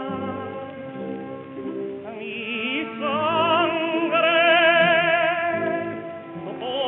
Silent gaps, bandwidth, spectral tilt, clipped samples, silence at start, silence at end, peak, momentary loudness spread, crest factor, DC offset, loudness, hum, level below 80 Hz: none; 4 kHz; -1.5 dB/octave; under 0.1%; 0 s; 0 s; -4 dBFS; 18 LU; 18 dB; under 0.1%; -21 LUFS; none; -68 dBFS